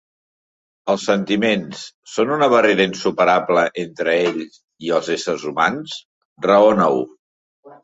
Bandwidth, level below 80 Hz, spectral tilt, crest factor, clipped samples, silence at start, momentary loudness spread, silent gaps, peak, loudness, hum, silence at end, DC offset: 8 kHz; -60 dBFS; -5 dB/octave; 16 dB; under 0.1%; 0.85 s; 17 LU; 1.94-2.03 s, 4.64-4.68 s, 6.05-6.36 s, 7.19-7.63 s; -2 dBFS; -18 LUFS; none; 0.1 s; under 0.1%